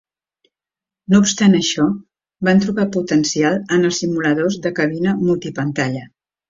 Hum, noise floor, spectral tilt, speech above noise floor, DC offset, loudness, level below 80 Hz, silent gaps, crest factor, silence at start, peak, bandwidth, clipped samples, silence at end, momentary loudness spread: none; -89 dBFS; -5 dB/octave; 72 dB; under 0.1%; -17 LUFS; -54 dBFS; none; 16 dB; 1.1 s; -2 dBFS; 7.8 kHz; under 0.1%; 0.45 s; 8 LU